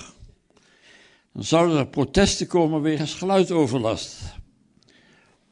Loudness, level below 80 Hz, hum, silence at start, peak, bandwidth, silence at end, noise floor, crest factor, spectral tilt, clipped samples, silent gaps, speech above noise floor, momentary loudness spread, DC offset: -22 LUFS; -44 dBFS; none; 0 s; -4 dBFS; 10.5 kHz; 1.1 s; -59 dBFS; 20 dB; -5 dB/octave; under 0.1%; none; 38 dB; 15 LU; under 0.1%